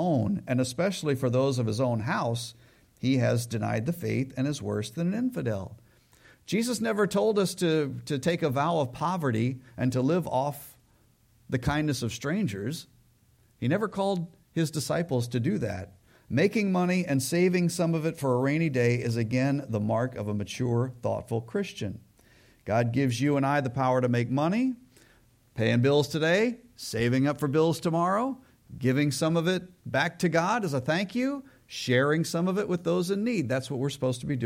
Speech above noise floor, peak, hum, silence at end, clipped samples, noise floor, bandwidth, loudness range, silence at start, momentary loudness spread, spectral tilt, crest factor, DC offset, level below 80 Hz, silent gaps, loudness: 36 dB; -10 dBFS; none; 0 s; under 0.1%; -63 dBFS; 16.5 kHz; 4 LU; 0 s; 8 LU; -6 dB/octave; 16 dB; under 0.1%; -60 dBFS; none; -28 LUFS